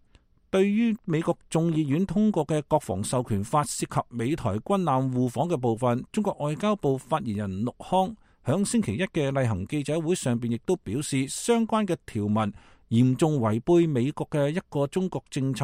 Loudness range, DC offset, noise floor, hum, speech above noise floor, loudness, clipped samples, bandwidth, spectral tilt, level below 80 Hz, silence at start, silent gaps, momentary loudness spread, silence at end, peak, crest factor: 2 LU; under 0.1%; -60 dBFS; none; 35 dB; -26 LUFS; under 0.1%; 16 kHz; -6.5 dB/octave; -56 dBFS; 0.55 s; none; 6 LU; 0 s; -10 dBFS; 16 dB